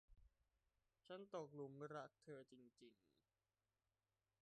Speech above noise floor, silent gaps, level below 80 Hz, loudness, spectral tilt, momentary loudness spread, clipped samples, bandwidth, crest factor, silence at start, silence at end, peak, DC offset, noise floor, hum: over 32 dB; none; -84 dBFS; -57 LUFS; -6 dB/octave; 10 LU; under 0.1%; 8.8 kHz; 20 dB; 0.1 s; 1.5 s; -40 dBFS; under 0.1%; under -90 dBFS; none